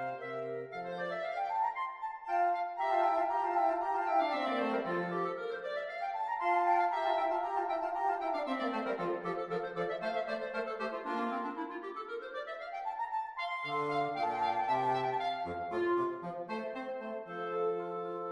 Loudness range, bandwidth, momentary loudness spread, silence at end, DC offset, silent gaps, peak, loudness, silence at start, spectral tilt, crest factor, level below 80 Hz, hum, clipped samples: 5 LU; 11 kHz; 9 LU; 0 s; under 0.1%; none; -18 dBFS; -35 LUFS; 0 s; -6 dB/octave; 16 dB; -74 dBFS; none; under 0.1%